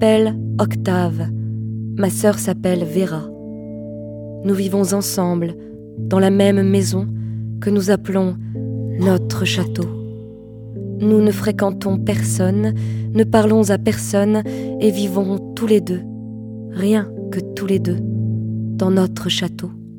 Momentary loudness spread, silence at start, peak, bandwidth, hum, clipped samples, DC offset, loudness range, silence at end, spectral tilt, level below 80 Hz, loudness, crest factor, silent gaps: 16 LU; 0 s; 0 dBFS; 19 kHz; none; under 0.1%; under 0.1%; 4 LU; 0 s; -6 dB/octave; -50 dBFS; -18 LUFS; 18 dB; none